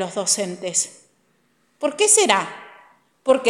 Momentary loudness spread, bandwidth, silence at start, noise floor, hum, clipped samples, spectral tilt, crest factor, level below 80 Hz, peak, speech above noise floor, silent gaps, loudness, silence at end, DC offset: 14 LU; 15.5 kHz; 0 s; -64 dBFS; none; under 0.1%; -1 dB/octave; 22 dB; -74 dBFS; 0 dBFS; 44 dB; none; -19 LUFS; 0 s; under 0.1%